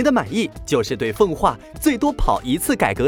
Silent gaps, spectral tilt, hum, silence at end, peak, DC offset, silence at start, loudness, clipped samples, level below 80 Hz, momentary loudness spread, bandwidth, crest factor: none; -5 dB/octave; none; 0 s; -4 dBFS; under 0.1%; 0 s; -20 LUFS; under 0.1%; -32 dBFS; 5 LU; over 20 kHz; 16 dB